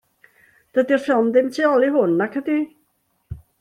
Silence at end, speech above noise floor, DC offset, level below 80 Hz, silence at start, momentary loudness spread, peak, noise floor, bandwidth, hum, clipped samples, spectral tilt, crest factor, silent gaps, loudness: 0.25 s; 49 dB; under 0.1%; -52 dBFS; 0.75 s; 18 LU; -4 dBFS; -67 dBFS; 12.5 kHz; none; under 0.1%; -6.5 dB/octave; 16 dB; none; -19 LUFS